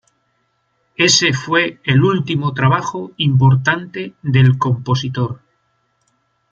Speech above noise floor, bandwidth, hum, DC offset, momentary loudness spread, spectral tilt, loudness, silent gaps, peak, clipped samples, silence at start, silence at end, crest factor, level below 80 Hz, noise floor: 50 dB; 7.6 kHz; none; under 0.1%; 12 LU; -4.5 dB/octave; -15 LUFS; none; 0 dBFS; under 0.1%; 1 s; 1.15 s; 16 dB; -54 dBFS; -65 dBFS